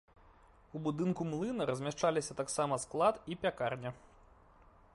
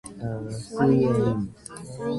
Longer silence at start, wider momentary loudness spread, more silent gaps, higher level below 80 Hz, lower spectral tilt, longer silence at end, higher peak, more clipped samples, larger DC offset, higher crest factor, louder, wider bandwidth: first, 0.75 s vs 0.05 s; second, 9 LU vs 15 LU; neither; second, -66 dBFS vs -50 dBFS; second, -5 dB/octave vs -7.5 dB/octave; first, 0.95 s vs 0 s; second, -18 dBFS vs -8 dBFS; neither; neither; about the same, 20 dB vs 18 dB; second, -36 LUFS vs -25 LUFS; about the same, 11.5 kHz vs 11.5 kHz